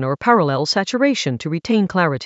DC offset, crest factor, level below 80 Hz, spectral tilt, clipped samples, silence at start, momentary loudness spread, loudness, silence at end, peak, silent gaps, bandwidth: under 0.1%; 18 dB; -56 dBFS; -5.5 dB/octave; under 0.1%; 0 s; 6 LU; -18 LUFS; 0 s; 0 dBFS; none; 8.2 kHz